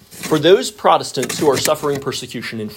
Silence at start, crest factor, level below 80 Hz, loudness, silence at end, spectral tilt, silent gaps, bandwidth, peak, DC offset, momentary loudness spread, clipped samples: 0.1 s; 18 dB; -54 dBFS; -17 LUFS; 0 s; -4 dB/octave; none; 16.5 kHz; 0 dBFS; under 0.1%; 11 LU; under 0.1%